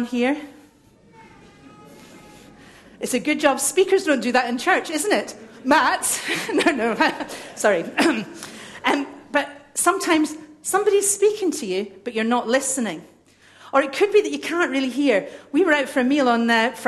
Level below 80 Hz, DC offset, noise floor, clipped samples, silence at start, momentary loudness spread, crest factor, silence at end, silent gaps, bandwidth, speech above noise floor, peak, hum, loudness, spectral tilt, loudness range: -64 dBFS; under 0.1%; -53 dBFS; under 0.1%; 0 s; 10 LU; 20 dB; 0 s; none; 13 kHz; 32 dB; -2 dBFS; none; -21 LUFS; -2.5 dB/octave; 3 LU